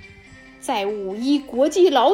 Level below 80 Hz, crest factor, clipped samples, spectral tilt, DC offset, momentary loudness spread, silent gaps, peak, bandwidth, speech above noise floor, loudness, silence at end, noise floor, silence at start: -56 dBFS; 14 dB; under 0.1%; -4 dB/octave; under 0.1%; 10 LU; none; -6 dBFS; 16 kHz; 27 dB; -20 LUFS; 0 s; -45 dBFS; 0.65 s